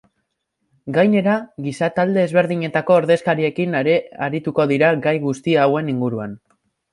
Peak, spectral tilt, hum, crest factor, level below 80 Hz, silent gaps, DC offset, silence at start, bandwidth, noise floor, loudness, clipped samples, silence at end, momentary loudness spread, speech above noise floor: -2 dBFS; -7 dB/octave; none; 16 dB; -62 dBFS; none; under 0.1%; 0.85 s; 11.5 kHz; -73 dBFS; -18 LUFS; under 0.1%; 0.55 s; 8 LU; 56 dB